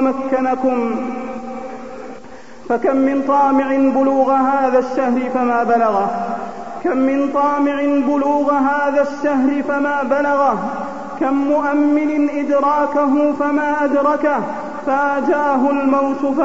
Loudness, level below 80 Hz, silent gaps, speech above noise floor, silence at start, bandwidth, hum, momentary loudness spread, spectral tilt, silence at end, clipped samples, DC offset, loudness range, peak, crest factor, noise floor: -17 LUFS; -54 dBFS; none; 22 dB; 0 s; 7.8 kHz; none; 10 LU; -6.5 dB/octave; 0 s; under 0.1%; 1%; 2 LU; -2 dBFS; 14 dB; -38 dBFS